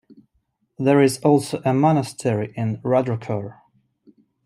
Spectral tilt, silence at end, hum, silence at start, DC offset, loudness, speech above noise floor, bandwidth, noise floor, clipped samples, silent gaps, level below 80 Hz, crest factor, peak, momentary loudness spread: -7 dB/octave; 0.95 s; none; 0.8 s; under 0.1%; -20 LUFS; 50 dB; 15.5 kHz; -70 dBFS; under 0.1%; none; -62 dBFS; 18 dB; -4 dBFS; 10 LU